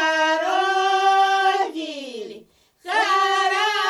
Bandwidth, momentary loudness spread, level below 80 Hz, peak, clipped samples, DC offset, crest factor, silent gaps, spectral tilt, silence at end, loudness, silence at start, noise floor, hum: 12.5 kHz; 16 LU; -70 dBFS; -8 dBFS; under 0.1%; under 0.1%; 12 dB; none; 0 dB/octave; 0 s; -19 LUFS; 0 s; -49 dBFS; none